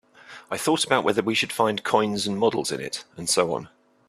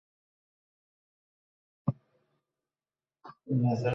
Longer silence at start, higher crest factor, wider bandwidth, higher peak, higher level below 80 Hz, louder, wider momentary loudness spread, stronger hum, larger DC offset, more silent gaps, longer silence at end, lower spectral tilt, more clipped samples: second, 0.3 s vs 1.85 s; about the same, 22 dB vs 22 dB; first, 14.5 kHz vs 6.6 kHz; first, -2 dBFS vs -16 dBFS; first, -64 dBFS vs -70 dBFS; first, -24 LUFS vs -32 LUFS; second, 9 LU vs 20 LU; neither; neither; neither; first, 0.4 s vs 0 s; second, -3 dB/octave vs -9 dB/octave; neither